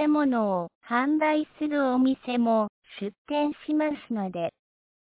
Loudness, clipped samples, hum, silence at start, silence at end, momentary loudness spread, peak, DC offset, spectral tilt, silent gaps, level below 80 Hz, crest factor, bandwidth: -26 LUFS; under 0.1%; none; 0 s; 0.5 s; 10 LU; -12 dBFS; under 0.1%; -10 dB/octave; 0.75-0.81 s, 2.69-2.82 s, 3.18-3.25 s; -70 dBFS; 14 dB; 4 kHz